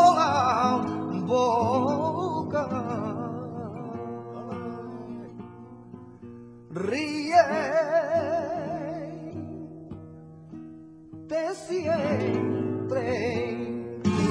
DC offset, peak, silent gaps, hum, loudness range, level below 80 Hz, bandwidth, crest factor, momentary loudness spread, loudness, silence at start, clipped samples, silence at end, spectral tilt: under 0.1%; -6 dBFS; none; none; 9 LU; -62 dBFS; 10.5 kHz; 20 dB; 22 LU; -27 LUFS; 0 s; under 0.1%; 0 s; -6 dB/octave